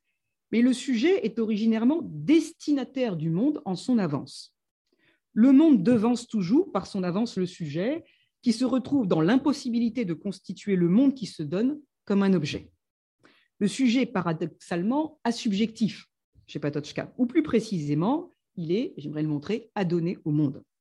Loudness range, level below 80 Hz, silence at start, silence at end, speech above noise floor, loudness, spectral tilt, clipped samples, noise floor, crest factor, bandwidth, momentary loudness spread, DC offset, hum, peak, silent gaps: 5 LU; -68 dBFS; 0.5 s; 0.2 s; 56 dB; -26 LUFS; -6.5 dB/octave; under 0.1%; -81 dBFS; 16 dB; 11.5 kHz; 10 LU; under 0.1%; none; -10 dBFS; 4.71-4.85 s, 12.90-13.19 s, 16.24-16.33 s